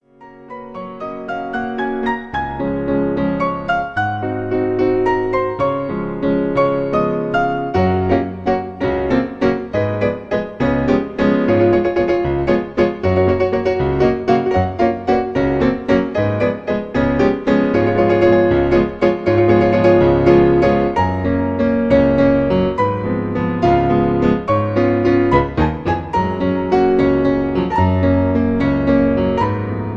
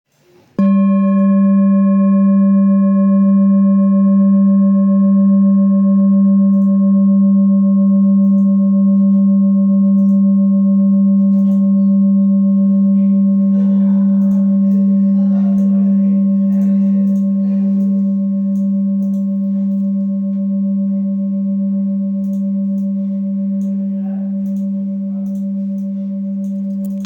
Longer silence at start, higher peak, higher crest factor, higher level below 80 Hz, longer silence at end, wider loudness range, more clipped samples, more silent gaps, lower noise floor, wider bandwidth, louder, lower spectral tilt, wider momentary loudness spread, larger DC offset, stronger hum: second, 0.2 s vs 0.6 s; first, 0 dBFS vs -6 dBFS; first, 16 dB vs 6 dB; first, -34 dBFS vs -68 dBFS; about the same, 0 s vs 0 s; about the same, 5 LU vs 7 LU; neither; neither; second, -41 dBFS vs -51 dBFS; first, 7 kHz vs 2.5 kHz; second, -16 LUFS vs -13 LUFS; second, -8.5 dB/octave vs -12.5 dB/octave; about the same, 8 LU vs 8 LU; neither; neither